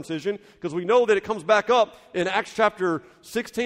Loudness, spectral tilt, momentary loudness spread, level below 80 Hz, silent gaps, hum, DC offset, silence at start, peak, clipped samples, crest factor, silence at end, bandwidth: -23 LUFS; -4.5 dB/octave; 12 LU; -62 dBFS; none; none; under 0.1%; 0 s; -8 dBFS; under 0.1%; 16 dB; 0 s; 15.5 kHz